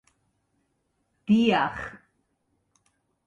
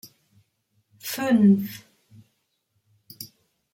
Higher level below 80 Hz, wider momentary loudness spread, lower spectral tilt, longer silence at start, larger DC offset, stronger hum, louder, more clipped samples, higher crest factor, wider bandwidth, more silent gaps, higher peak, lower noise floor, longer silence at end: first, -60 dBFS vs -70 dBFS; second, 19 LU vs 23 LU; about the same, -6.5 dB/octave vs -6.5 dB/octave; first, 1.3 s vs 1.05 s; neither; neither; about the same, -23 LUFS vs -21 LUFS; neither; about the same, 20 dB vs 18 dB; second, 7.4 kHz vs 16.5 kHz; neither; about the same, -10 dBFS vs -8 dBFS; about the same, -74 dBFS vs -73 dBFS; first, 1.3 s vs 0.5 s